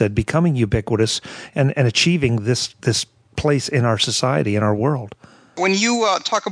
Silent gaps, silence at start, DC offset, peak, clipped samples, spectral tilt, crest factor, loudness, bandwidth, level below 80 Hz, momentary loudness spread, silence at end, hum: none; 0 s; under 0.1%; -2 dBFS; under 0.1%; -4.5 dB/octave; 16 dB; -19 LUFS; 11 kHz; -42 dBFS; 7 LU; 0 s; none